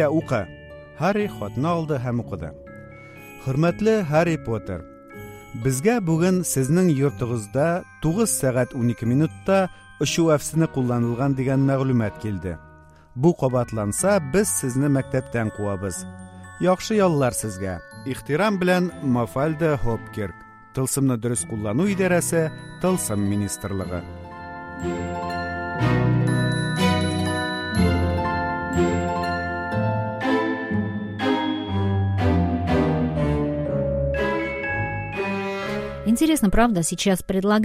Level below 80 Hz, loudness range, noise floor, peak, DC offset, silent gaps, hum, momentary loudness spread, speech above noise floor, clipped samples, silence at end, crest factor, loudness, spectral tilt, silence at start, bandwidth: -40 dBFS; 3 LU; -42 dBFS; -4 dBFS; under 0.1%; none; none; 12 LU; 20 dB; under 0.1%; 0 s; 18 dB; -23 LUFS; -5.5 dB/octave; 0 s; 15.5 kHz